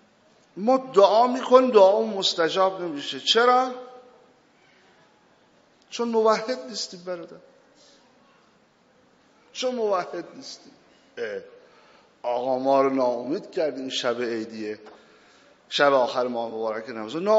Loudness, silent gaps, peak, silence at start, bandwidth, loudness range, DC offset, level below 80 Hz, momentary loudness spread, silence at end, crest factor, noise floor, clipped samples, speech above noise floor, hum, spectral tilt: -23 LUFS; none; -2 dBFS; 0.55 s; 7.6 kHz; 12 LU; under 0.1%; -80 dBFS; 18 LU; 0 s; 24 dB; -60 dBFS; under 0.1%; 38 dB; none; -1.5 dB/octave